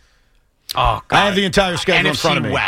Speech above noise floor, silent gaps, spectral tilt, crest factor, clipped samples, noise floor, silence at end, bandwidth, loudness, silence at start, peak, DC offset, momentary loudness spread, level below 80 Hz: 41 dB; none; -4 dB/octave; 16 dB; under 0.1%; -57 dBFS; 0 s; 16.5 kHz; -16 LUFS; 0.7 s; -2 dBFS; under 0.1%; 4 LU; -34 dBFS